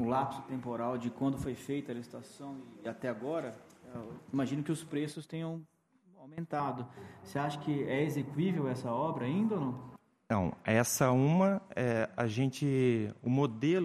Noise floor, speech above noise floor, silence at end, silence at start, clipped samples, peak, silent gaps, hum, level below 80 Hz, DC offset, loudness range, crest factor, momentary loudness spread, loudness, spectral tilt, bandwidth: -63 dBFS; 29 dB; 0 s; 0 s; under 0.1%; -14 dBFS; none; none; -66 dBFS; under 0.1%; 9 LU; 20 dB; 17 LU; -34 LUFS; -6 dB/octave; 15 kHz